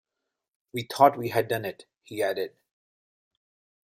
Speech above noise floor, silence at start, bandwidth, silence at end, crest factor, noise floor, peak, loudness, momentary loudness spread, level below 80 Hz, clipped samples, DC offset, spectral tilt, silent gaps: 59 dB; 0.75 s; 16 kHz; 1.45 s; 24 dB; -85 dBFS; -4 dBFS; -26 LUFS; 16 LU; -70 dBFS; under 0.1%; under 0.1%; -5 dB/octave; none